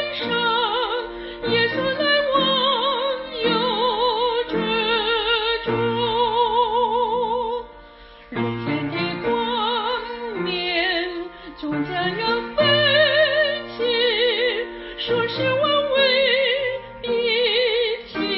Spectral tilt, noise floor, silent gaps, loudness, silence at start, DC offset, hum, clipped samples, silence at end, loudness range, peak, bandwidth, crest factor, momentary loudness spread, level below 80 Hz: -9 dB/octave; -44 dBFS; none; -20 LUFS; 0 s; under 0.1%; none; under 0.1%; 0 s; 5 LU; -6 dBFS; 5.8 kHz; 16 dB; 10 LU; -50 dBFS